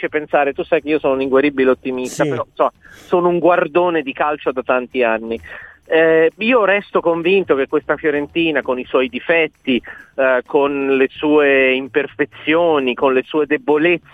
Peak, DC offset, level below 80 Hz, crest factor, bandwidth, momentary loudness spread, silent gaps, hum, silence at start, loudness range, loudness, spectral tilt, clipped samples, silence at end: -2 dBFS; under 0.1%; -54 dBFS; 14 dB; 12 kHz; 7 LU; none; none; 0 s; 2 LU; -16 LUFS; -5.5 dB/octave; under 0.1%; 0.15 s